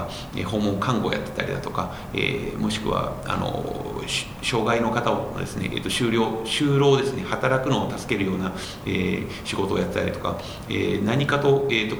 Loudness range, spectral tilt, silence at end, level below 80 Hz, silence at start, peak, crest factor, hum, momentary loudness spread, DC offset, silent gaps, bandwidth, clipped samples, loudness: 4 LU; -5.5 dB/octave; 0 s; -44 dBFS; 0 s; -4 dBFS; 20 dB; none; 9 LU; under 0.1%; none; over 20 kHz; under 0.1%; -24 LUFS